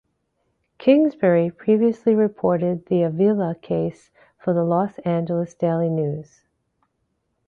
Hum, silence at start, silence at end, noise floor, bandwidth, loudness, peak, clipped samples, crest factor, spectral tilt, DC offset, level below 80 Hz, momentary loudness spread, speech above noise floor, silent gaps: none; 0.8 s; 1.25 s; -73 dBFS; 7 kHz; -21 LUFS; -4 dBFS; under 0.1%; 18 dB; -9.5 dB/octave; under 0.1%; -62 dBFS; 7 LU; 53 dB; none